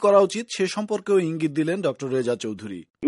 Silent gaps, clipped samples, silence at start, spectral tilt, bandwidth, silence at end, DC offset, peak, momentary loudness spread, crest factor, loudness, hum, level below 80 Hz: 2.90-2.94 s; under 0.1%; 0 s; -5.5 dB/octave; 11.5 kHz; 0 s; under 0.1%; -4 dBFS; 10 LU; 18 dB; -24 LUFS; none; -68 dBFS